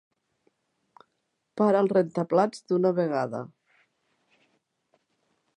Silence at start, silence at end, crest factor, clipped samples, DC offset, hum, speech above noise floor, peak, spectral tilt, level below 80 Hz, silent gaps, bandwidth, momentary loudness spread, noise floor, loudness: 1.55 s; 2.1 s; 20 dB; under 0.1%; under 0.1%; none; 54 dB; -8 dBFS; -8 dB/octave; -80 dBFS; none; 10.5 kHz; 14 LU; -78 dBFS; -25 LUFS